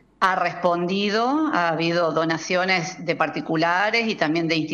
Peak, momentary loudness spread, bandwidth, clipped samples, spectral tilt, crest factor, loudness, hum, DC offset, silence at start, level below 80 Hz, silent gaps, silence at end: -6 dBFS; 3 LU; 9 kHz; under 0.1%; -5 dB/octave; 16 dB; -22 LUFS; none; under 0.1%; 0.2 s; -62 dBFS; none; 0 s